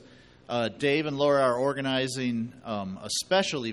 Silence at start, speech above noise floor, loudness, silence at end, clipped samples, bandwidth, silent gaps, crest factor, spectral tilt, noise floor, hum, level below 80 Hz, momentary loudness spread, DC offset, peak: 0.5 s; 25 dB; -27 LUFS; 0 s; under 0.1%; 12 kHz; none; 16 dB; -4 dB/octave; -52 dBFS; none; -64 dBFS; 11 LU; under 0.1%; -10 dBFS